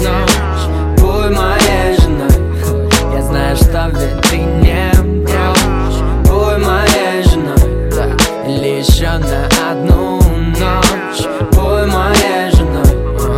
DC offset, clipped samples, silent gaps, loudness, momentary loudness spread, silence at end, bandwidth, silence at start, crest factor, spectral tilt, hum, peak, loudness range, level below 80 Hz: 0.1%; under 0.1%; none; -12 LUFS; 5 LU; 0 s; 16.5 kHz; 0 s; 10 dB; -5 dB/octave; none; 0 dBFS; 1 LU; -14 dBFS